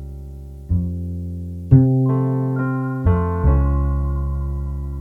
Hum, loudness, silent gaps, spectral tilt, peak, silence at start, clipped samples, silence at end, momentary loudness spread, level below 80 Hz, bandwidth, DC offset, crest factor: none; -20 LUFS; none; -11.5 dB/octave; 0 dBFS; 0 s; under 0.1%; 0 s; 15 LU; -24 dBFS; 2.6 kHz; under 0.1%; 18 dB